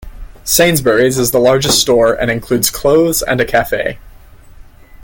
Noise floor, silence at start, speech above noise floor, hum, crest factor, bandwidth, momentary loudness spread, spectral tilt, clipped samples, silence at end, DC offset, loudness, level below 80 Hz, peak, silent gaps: -37 dBFS; 0 s; 25 dB; none; 14 dB; 17 kHz; 7 LU; -3.5 dB/octave; under 0.1%; 0.4 s; under 0.1%; -12 LUFS; -34 dBFS; 0 dBFS; none